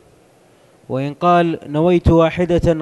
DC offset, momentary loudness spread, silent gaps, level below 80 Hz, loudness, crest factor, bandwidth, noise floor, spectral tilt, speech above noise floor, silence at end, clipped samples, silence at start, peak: under 0.1%; 11 LU; none; -32 dBFS; -16 LUFS; 14 dB; 11 kHz; -51 dBFS; -8 dB/octave; 36 dB; 0 s; under 0.1%; 0.9 s; -2 dBFS